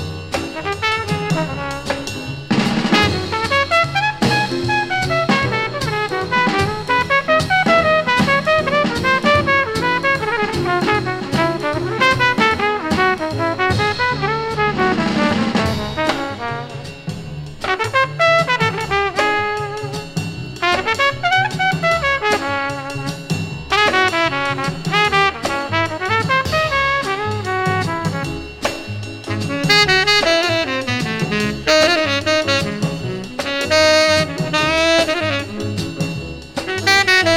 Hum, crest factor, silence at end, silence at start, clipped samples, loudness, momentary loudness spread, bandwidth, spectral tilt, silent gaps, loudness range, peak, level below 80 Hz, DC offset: none; 18 dB; 0 s; 0 s; under 0.1%; -17 LUFS; 11 LU; 18 kHz; -4.5 dB/octave; none; 4 LU; 0 dBFS; -42 dBFS; under 0.1%